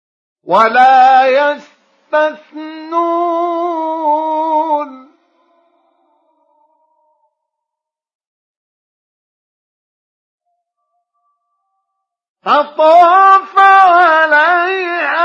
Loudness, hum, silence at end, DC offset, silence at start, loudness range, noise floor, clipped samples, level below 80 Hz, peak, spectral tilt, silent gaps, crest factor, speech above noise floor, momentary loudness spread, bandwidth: -10 LUFS; none; 0 s; under 0.1%; 0.45 s; 13 LU; -82 dBFS; under 0.1%; -72 dBFS; 0 dBFS; -4 dB/octave; 8.15-8.19 s, 8.27-10.38 s, 12.29-12.35 s; 14 dB; 73 dB; 12 LU; 7.2 kHz